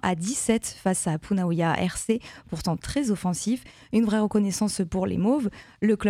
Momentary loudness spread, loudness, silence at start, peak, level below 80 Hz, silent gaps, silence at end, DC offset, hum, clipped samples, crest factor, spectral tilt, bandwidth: 6 LU; -26 LUFS; 0.05 s; -6 dBFS; -50 dBFS; none; 0 s; under 0.1%; none; under 0.1%; 18 dB; -5.5 dB/octave; 15 kHz